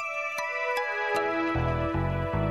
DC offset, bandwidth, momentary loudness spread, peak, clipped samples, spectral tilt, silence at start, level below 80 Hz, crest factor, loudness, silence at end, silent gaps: under 0.1%; 15 kHz; 3 LU; -16 dBFS; under 0.1%; -6.5 dB/octave; 0 s; -42 dBFS; 14 dB; -28 LUFS; 0 s; none